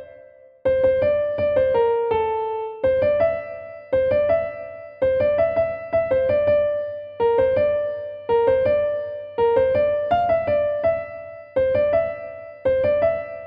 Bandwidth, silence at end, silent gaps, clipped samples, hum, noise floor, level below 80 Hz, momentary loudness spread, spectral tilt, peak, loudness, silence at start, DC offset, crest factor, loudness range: 5.2 kHz; 0 s; none; under 0.1%; none; -47 dBFS; -48 dBFS; 10 LU; -8.5 dB/octave; -8 dBFS; -21 LUFS; 0 s; under 0.1%; 12 dB; 1 LU